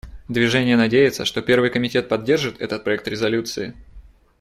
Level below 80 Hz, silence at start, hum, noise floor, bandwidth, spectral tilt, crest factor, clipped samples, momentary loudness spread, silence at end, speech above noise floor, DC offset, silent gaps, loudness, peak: -48 dBFS; 0.05 s; none; -45 dBFS; 14.5 kHz; -5 dB/octave; 16 dB; under 0.1%; 10 LU; 0.4 s; 26 dB; under 0.1%; none; -20 LUFS; -4 dBFS